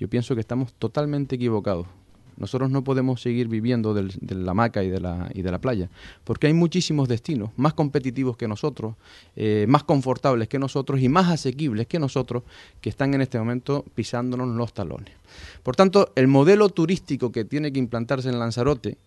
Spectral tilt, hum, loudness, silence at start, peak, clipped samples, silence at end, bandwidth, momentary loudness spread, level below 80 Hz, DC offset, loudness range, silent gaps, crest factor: -7 dB/octave; none; -23 LUFS; 0 s; -2 dBFS; under 0.1%; 0.15 s; 11.5 kHz; 12 LU; -48 dBFS; under 0.1%; 5 LU; none; 20 dB